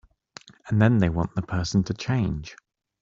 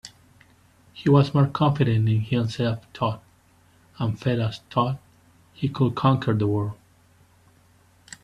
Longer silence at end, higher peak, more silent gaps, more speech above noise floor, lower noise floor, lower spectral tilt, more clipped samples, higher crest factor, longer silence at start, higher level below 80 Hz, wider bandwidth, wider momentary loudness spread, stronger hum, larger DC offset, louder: second, 0.45 s vs 1.5 s; about the same, -4 dBFS vs -6 dBFS; neither; second, 26 dB vs 36 dB; second, -49 dBFS vs -58 dBFS; about the same, -7 dB/octave vs -8 dB/octave; neither; about the same, 20 dB vs 20 dB; first, 0.65 s vs 0.05 s; first, -46 dBFS vs -56 dBFS; second, 7.6 kHz vs 9.8 kHz; about the same, 14 LU vs 12 LU; neither; neither; about the same, -24 LUFS vs -23 LUFS